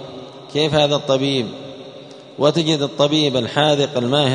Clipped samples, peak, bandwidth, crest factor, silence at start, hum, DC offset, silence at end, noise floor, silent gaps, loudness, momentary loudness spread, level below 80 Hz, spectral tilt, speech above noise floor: under 0.1%; 0 dBFS; 10 kHz; 18 dB; 0 s; none; under 0.1%; 0 s; -38 dBFS; none; -17 LUFS; 20 LU; -56 dBFS; -5 dB/octave; 21 dB